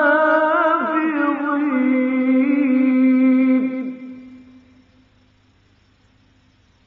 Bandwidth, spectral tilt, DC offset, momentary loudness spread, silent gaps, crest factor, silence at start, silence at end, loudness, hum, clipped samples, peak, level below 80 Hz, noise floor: 4.2 kHz; -3.5 dB/octave; under 0.1%; 10 LU; none; 14 dB; 0 s; 2.5 s; -17 LUFS; none; under 0.1%; -6 dBFS; -66 dBFS; -56 dBFS